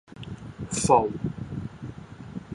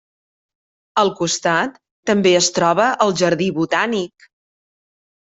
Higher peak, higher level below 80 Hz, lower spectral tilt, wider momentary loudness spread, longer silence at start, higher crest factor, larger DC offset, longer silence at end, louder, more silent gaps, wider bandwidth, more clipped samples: second, -6 dBFS vs -2 dBFS; first, -48 dBFS vs -62 dBFS; first, -5 dB/octave vs -3.5 dB/octave; first, 20 LU vs 10 LU; second, 0.1 s vs 0.95 s; first, 22 dB vs 16 dB; neither; second, 0 s vs 1.2 s; second, -26 LUFS vs -17 LUFS; second, none vs 1.91-2.03 s; first, 11.5 kHz vs 8.2 kHz; neither